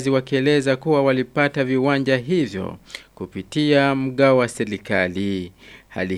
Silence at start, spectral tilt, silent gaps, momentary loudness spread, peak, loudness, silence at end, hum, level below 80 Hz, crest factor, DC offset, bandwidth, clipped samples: 0 s; -6 dB/octave; none; 16 LU; -2 dBFS; -20 LUFS; 0 s; none; -56 dBFS; 18 dB; under 0.1%; 12.5 kHz; under 0.1%